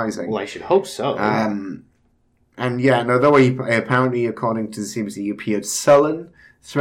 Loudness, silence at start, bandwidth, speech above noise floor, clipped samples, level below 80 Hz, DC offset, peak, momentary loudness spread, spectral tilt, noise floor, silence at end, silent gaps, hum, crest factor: -19 LUFS; 0 s; 17 kHz; 42 dB; under 0.1%; -60 dBFS; under 0.1%; -4 dBFS; 12 LU; -5.5 dB/octave; -61 dBFS; 0 s; none; none; 16 dB